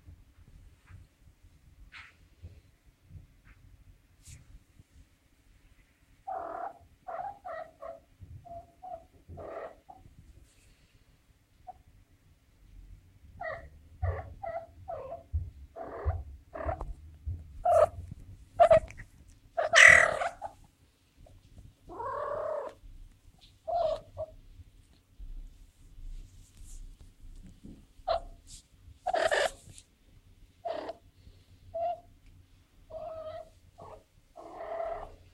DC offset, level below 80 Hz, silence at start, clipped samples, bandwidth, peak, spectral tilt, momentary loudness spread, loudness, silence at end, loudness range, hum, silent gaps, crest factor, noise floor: under 0.1%; -50 dBFS; 0.1 s; under 0.1%; 12.5 kHz; -4 dBFS; -2.5 dB/octave; 26 LU; -29 LUFS; 0.2 s; 25 LU; none; none; 32 dB; -65 dBFS